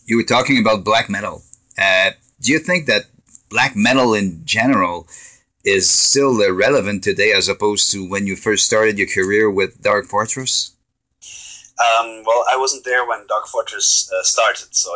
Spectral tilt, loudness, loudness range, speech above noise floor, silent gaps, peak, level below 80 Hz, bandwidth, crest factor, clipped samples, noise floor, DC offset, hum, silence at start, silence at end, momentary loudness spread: -2.5 dB/octave; -16 LUFS; 4 LU; 33 dB; none; -2 dBFS; -52 dBFS; 8 kHz; 16 dB; under 0.1%; -50 dBFS; under 0.1%; none; 0.1 s; 0 s; 9 LU